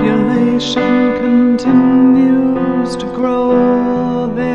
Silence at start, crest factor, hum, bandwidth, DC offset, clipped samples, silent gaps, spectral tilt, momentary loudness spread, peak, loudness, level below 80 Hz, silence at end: 0 s; 10 dB; none; 8.6 kHz; under 0.1%; under 0.1%; none; -6.5 dB/octave; 7 LU; 0 dBFS; -12 LUFS; -42 dBFS; 0 s